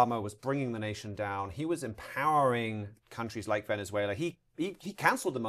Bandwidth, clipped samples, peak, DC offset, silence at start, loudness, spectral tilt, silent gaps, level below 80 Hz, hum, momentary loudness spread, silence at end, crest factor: 15 kHz; under 0.1%; -8 dBFS; under 0.1%; 0 s; -33 LUFS; -5.5 dB/octave; none; -64 dBFS; none; 10 LU; 0 s; 24 dB